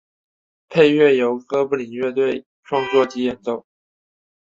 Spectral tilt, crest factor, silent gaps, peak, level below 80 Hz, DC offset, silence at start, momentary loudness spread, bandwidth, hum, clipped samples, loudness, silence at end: -6 dB/octave; 18 dB; 2.46-2.63 s; -2 dBFS; -64 dBFS; under 0.1%; 0.7 s; 13 LU; 7.6 kHz; none; under 0.1%; -19 LUFS; 0.95 s